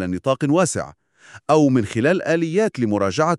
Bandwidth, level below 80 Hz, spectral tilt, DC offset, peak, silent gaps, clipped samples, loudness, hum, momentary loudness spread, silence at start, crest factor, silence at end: 12 kHz; -58 dBFS; -6 dB/octave; under 0.1%; -4 dBFS; none; under 0.1%; -19 LUFS; none; 8 LU; 0 s; 16 dB; 0 s